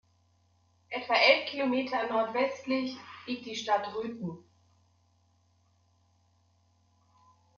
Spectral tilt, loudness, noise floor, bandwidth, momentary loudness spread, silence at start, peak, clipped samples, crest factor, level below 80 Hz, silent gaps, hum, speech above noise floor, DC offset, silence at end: -1 dB/octave; -29 LUFS; -69 dBFS; 7.2 kHz; 17 LU; 0.9 s; -8 dBFS; under 0.1%; 26 dB; -80 dBFS; none; none; 39 dB; under 0.1%; 3.15 s